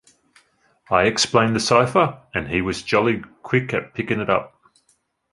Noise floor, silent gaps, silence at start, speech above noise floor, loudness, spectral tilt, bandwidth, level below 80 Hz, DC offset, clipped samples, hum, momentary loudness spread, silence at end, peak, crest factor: -65 dBFS; none; 0.9 s; 45 dB; -20 LUFS; -4.5 dB/octave; 11.5 kHz; -48 dBFS; under 0.1%; under 0.1%; none; 8 LU; 0.85 s; -2 dBFS; 20 dB